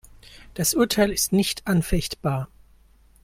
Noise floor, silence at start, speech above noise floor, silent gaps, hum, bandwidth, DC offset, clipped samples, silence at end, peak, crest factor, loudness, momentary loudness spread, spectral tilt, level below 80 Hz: -55 dBFS; 0.3 s; 32 dB; none; none; 16.5 kHz; under 0.1%; under 0.1%; 0.8 s; -8 dBFS; 18 dB; -23 LUFS; 10 LU; -4.5 dB/octave; -40 dBFS